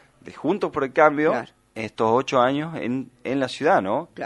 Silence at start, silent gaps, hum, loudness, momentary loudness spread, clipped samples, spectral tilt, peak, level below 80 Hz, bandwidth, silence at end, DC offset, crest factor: 0.25 s; none; none; -22 LUFS; 11 LU; under 0.1%; -6 dB/octave; -2 dBFS; -62 dBFS; 11.5 kHz; 0 s; under 0.1%; 22 dB